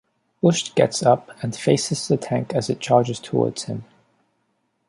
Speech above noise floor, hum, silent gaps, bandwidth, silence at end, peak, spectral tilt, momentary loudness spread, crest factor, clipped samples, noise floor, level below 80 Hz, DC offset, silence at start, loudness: 50 dB; none; none; 11.5 kHz; 1.05 s; -2 dBFS; -5 dB/octave; 8 LU; 20 dB; under 0.1%; -70 dBFS; -62 dBFS; under 0.1%; 0.45 s; -21 LUFS